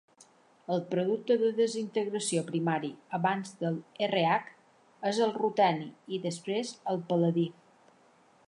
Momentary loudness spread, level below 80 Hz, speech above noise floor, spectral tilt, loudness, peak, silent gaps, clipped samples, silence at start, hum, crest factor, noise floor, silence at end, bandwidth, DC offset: 9 LU; -82 dBFS; 33 dB; -5.5 dB/octave; -31 LUFS; -12 dBFS; none; under 0.1%; 0.7 s; none; 18 dB; -63 dBFS; 0.95 s; 11.5 kHz; under 0.1%